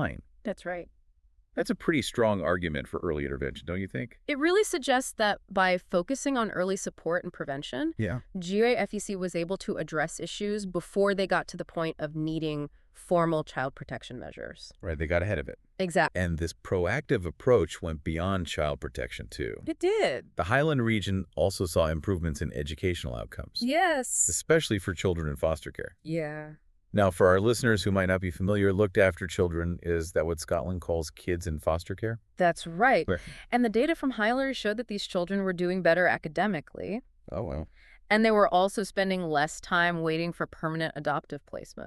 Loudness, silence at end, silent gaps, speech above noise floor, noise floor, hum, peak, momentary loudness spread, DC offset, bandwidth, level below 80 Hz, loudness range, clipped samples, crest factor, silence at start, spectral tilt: -29 LUFS; 0 s; none; 35 dB; -63 dBFS; none; -10 dBFS; 12 LU; under 0.1%; 13.5 kHz; -48 dBFS; 4 LU; under 0.1%; 20 dB; 0 s; -5 dB/octave